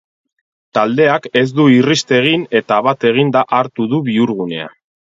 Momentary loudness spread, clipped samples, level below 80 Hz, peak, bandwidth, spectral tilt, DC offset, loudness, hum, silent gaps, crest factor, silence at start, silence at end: 9 LU; under 0.1%; -60 dBFS; 0 dBFS; 7.8 kHz; -5.5 dB/octave; under 0.1%; -14 LUFS; none; none; 14 dB; 0.75 s; 0.45 s